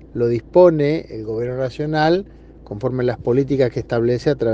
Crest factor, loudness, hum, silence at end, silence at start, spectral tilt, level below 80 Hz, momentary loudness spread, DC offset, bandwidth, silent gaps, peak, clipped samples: 18 dB; -19 LUFS; none; 0 s; 0 s; -8 dB/octave; -44 dBFS; 12 LU; under 0.1%; 7.4 kHz; none; 0 dBFS; under 0.1%